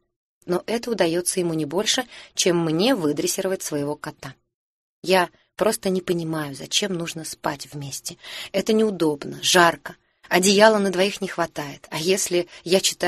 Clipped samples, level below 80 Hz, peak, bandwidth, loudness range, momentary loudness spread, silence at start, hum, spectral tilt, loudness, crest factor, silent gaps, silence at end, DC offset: under 0.1%; -62 dBFS; 0 dBFS; 13 kHz; 6 LU; 15 LU; 0.45 s; none; -3.5 dB/octave; -22 LUFS; 22 dB; 4.54-5.02 s; 0 s; under 0.1%